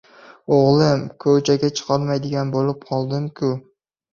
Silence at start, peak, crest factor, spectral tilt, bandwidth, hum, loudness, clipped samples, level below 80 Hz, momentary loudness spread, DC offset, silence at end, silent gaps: 0.3 s; -2 dBFS; 18 dB; -6.5 dB/octave; 7.4 kHz; none; -19 LUFS; under 0.1%; -56 dBFS; 9 LU; under 0.1%; 0.55 s; none